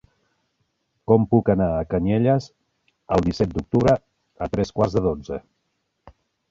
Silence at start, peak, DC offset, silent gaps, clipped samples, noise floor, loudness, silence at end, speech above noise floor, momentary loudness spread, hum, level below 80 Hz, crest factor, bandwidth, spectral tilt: 1.1 s; -2 dBFS; under 0.1%; none; under 0.1%; -74 dBFS; -21 LUFS; 0.4 s; 53 dB; 12 LU; none; -42 dBFS; 20 dB; 7.8 kHz; -8.5 dB/octave